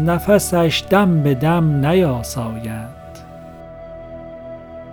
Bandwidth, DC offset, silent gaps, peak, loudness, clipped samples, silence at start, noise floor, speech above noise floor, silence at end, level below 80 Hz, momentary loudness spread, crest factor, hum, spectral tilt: 19.5 kHz; under 0.1%; none; 0 dBFS; -16 LUFS; under 0.1%; 0 s; -36 dBFS; 20 dB; 0 s; -40 dBFS; 22 LU; 18 dB; none; -6 dB/octave